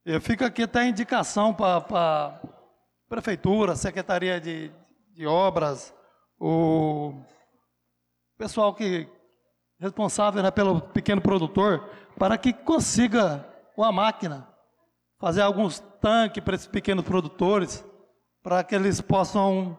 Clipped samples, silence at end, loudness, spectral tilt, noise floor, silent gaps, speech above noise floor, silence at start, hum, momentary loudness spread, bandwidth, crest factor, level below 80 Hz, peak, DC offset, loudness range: under 0.1%; 0 s; -25 LUFS; -5.5 dB/octave; -77 dBFS; none; 53 dB; 0.05 s; 60 Hz at -55 dBFS; 12 LU; 12.5 kHz; 14 dB; -52 dBFS; -12 dBFS; under 0.1%; 4 LU